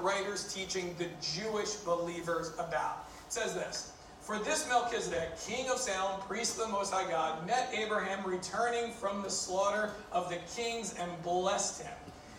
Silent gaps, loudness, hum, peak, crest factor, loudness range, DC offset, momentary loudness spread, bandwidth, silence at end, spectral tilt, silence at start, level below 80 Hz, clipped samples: none; -35 LUFS; none; -16 dBFS; 18 dB; 3 LU; under 0.1%; 7 LU; 17 kHz; 0 s; -2.5 dB/octave; 0 s; -64 dBFS; under 0.1%